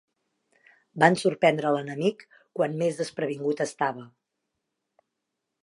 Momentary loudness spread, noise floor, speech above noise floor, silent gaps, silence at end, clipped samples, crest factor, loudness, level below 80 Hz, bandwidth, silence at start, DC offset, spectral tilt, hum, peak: 9 LU; -83 dBFS; 58 dB; none; 1.6 s; under 0.1%; 26 dB; -26 LUFS; -78 dBFS; 11.5 kHz; 0.95 s; under 0.1%; -5.5 dB/octave; none; -2 dBFS